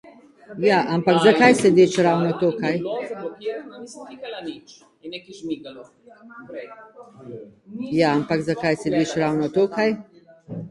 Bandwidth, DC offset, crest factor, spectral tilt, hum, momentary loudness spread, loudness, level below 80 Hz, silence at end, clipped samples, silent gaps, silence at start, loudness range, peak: 11.5 kHz; under 0.1%; 22 dB; -5.5 dB/octave; none; 24 LU; -20 LUFS; -62 dBFS; 0 s; under 0.1%; none; 0.5 s; 18 LU; 0 dBFS